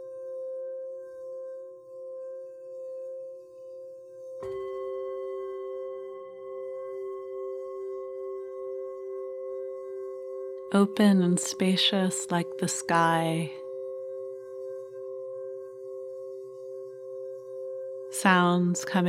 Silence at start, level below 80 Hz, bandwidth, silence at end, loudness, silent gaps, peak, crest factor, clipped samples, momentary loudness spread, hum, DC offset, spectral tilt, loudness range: 0 s; -78 dBFS; 15 kHz; 0 s; -30 LUFS; none; -6 dBFS; 24 dB; under 0.1%; 18 LU; none; under 0.1%; -4.5 dB/octave; 14 LU